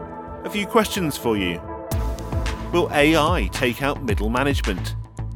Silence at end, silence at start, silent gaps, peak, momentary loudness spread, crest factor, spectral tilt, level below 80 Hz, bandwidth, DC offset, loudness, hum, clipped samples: 0 s; 0 s; none; -2 dBFS; 11 LU; 20 dB; -5 dB/octave; -30 dBFS; 20 kHz; under 0.1%; -22 LUFS; none; under 0.1%